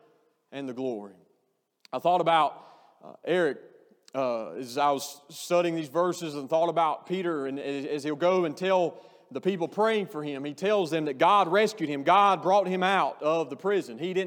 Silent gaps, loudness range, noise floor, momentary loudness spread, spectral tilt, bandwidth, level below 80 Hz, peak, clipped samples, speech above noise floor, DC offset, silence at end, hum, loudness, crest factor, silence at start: none; 5 LU; -75 dBFS; 13 LU; -5 dB/octave; 19 kHz; under -90 dBFS; -8 dBFS; under 0.1%; 48 dB; under 0.1%; 0 s; none; -27 LUFS; 18 dB; 0.5 s